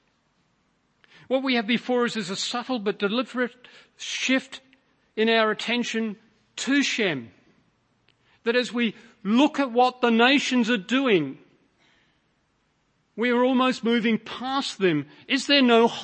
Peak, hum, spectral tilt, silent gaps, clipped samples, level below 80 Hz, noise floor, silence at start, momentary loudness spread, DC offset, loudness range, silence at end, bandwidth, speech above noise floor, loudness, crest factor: -4 dBFS; none; -4 dB/octave; none; under 0.1%; -76 dBFS; -69 dBFS; 1.3 s; 13 LU; under 0.1%; 5 LU; 0 s; 8.8 kHz; 46 dB; -23 LUFS; 20 dB